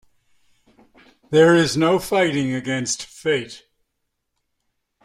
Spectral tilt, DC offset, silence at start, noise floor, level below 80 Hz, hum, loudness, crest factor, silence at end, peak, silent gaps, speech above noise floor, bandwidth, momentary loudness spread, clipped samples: -4.5 dB/octave; under 0.1%; 1.3 s; -76 dBFS; -56 dBFS; none; -19 LUFS; 18 dB; 1.45 s; -4 dBFS; none; 57 dB; 15.5 kHz; 10 LU; under 0.1%